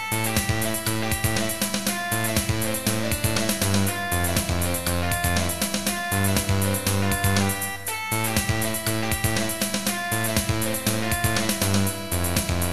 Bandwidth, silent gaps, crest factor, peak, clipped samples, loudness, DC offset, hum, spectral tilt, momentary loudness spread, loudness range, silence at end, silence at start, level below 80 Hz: 14 kHz; none; 18 dB; -6 dBFS; under 0.1%; -24 LUFS; 2%; none; -3.5 dB/octave; 3 LU; 1 LU; 0 s; 0 s; -40 dBFS